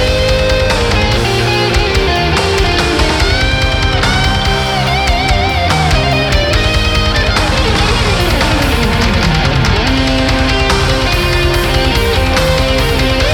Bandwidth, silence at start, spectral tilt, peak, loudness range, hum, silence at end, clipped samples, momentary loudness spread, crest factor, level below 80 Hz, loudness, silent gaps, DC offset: 19 kHz; 0 s; -4.5 dB/octave; 0 dBFS; 0 LU; none; 0 s; under 0.1%; 1 LU; 10 dB; -16 dBFS; -11 LUFS; none; under 0.1%